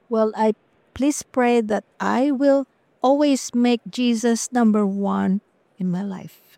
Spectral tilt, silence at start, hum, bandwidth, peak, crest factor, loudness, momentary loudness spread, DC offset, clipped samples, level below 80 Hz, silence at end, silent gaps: -5.5 dB/octave; 0.1 s; none; 15 kHz; -6 dBFS; 14 dB; -21 LUFS; 9 LU; under 0.1%; under 0.1%; -60 dBFS; 0.3 s; none